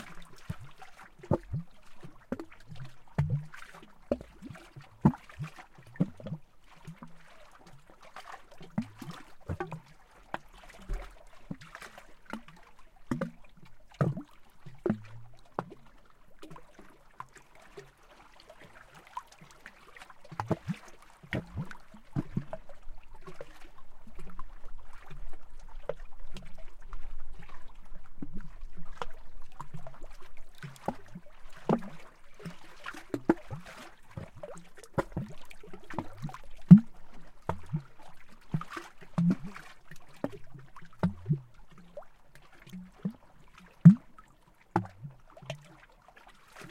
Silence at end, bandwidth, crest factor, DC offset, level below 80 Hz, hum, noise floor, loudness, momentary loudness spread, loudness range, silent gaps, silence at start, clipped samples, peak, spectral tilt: 0 s; 10.5 kHz; 32 dB; under 0.1%; -50 dBFS; none; -60 dBFS; -32 LUFS; 21 LU; 21 LU; none; 0 s; under 0.1%; -2 dBFS; -8.5 dB/octave